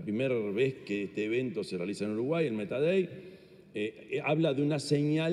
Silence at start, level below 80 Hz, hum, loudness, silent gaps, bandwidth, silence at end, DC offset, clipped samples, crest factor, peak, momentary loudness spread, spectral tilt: 0 s; -74 dBFS; none; -31 LUFS; none; 12 kHz; 0 s; under 0.1%; under 0.1%; 16 dB; -16 dBFS; 9 LU; -6.5 dB/octave